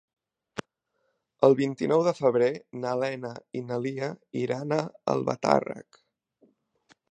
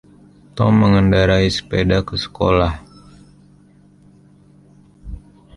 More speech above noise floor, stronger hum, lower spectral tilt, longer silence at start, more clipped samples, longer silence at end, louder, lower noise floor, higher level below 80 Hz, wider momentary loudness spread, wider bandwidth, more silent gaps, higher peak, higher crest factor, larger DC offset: first, 50 dB vs 34 dB; neither; about the same, -6.5 dB/octave vs -7 dB/octave; about the same, 0.55 s vs 0.55 s; neither; first, 1.3 s vs 0.4 s; second, -27 LUFS vs -16 LUFS; first, -76 dBFS vs -49 dBFS; second, -72 dBFS vs -34 dBFS; second, 16 LU vs 24 LU; second, 9.4 kHz vs 11.5 kHz; neither; second, -4 dBFS vs 0 dBFS; first, 24 dB vs 18 dB; neither